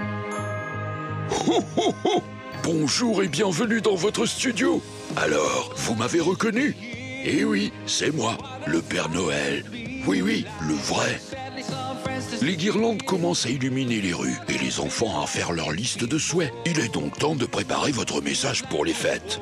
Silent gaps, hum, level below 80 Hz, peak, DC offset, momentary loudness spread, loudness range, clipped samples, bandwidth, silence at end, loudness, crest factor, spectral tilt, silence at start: none; none; -54 dBFS; -10 dBFS; under 0.1%; 8 LU; 2 LU; under 0.1%; 14 kHz; 0 s; -25 LUFS; 16 dB; -4 dB/octave; 0 s